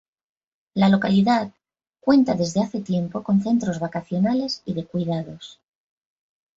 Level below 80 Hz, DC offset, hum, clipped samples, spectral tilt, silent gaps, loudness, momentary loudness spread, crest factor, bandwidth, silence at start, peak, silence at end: -60 dBFS; under 0.1%; none; under 0.1%; -6.5 dB/octave; none; -22 LUFS; 11 LU; 18 dB; 7.8 kHz; 0.75 s; -6 dBFS; 1.05 s